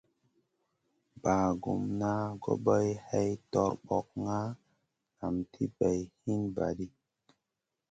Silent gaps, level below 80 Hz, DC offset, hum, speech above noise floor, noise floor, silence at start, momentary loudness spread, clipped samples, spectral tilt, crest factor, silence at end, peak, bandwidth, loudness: none; -58 dBFS; under 0.1%; none; 55 dB; -87 dBFS; 1.15 s; 8 LU; under 0.1%; -7.5 dB/octave; 20 dB; 1.05 s; -14 dBFS; 9 kHz; -33 LUFS